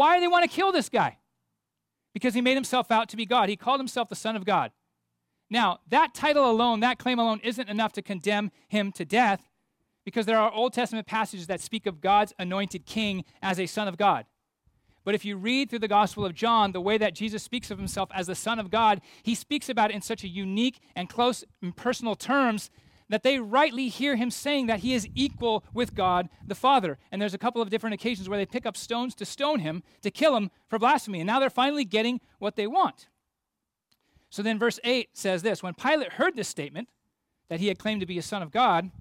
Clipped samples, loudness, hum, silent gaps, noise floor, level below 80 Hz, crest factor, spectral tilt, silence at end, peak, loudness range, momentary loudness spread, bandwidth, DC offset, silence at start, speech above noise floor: under 0.1%; -27 LUFS; none; none; -85 dBFS; -60 dBFS; 16 dB; -4.5 dB/octave; 0.05 s; -10 dBFS; 4 LU; 9 LU; 16.5 kHz; under 0.1%; 0 s; 59 dB